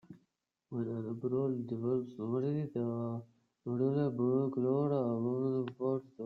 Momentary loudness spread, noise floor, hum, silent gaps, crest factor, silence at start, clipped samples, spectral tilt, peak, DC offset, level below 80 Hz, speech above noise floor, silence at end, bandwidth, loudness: 8 LU; -81 dBFS; none; none; 14 dB; 0.1 s; under 0.1%; -11.5 dB/octave; -20 dBFS; under 0.1%; -76 dBFS; 46 dB; 0 s; 4.7 kHz; -35 LUFS